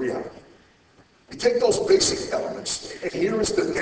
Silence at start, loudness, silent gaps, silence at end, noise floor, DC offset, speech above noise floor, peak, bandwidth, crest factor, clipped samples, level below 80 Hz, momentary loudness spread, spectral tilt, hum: 0 s; -23 LUFS; none; 0 s; -56 dBFS; under 0.1%; 34 dB; -6 dBFS; 8 kHz; 18 dB; under 0.1%; -52 dBFS; 13 LU; -3 dB/octave; none